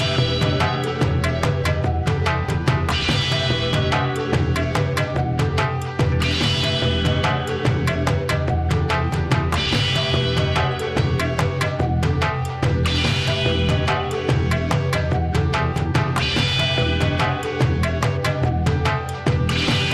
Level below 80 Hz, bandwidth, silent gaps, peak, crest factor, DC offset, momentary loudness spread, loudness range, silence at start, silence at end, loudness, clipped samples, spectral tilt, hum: -32 dBFS; 13.5 kHz; none; -6 dBFS; 14 dB; under 0.1%; 3 LU; 0 LU; 0 s; 0 s; -20 LUFS; under 0.1%; -5.5 dB/octave; none